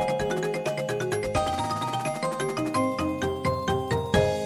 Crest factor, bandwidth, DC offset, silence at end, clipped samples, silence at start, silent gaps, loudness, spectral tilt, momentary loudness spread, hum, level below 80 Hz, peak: 18 dB; 17.5 kHz; under 0.1%; 0 s; under 0.1%; 0 s; none; -27 LUFS; -5.5 dB/octave; 4 LU; none; -46 dBFS; -8 dBFS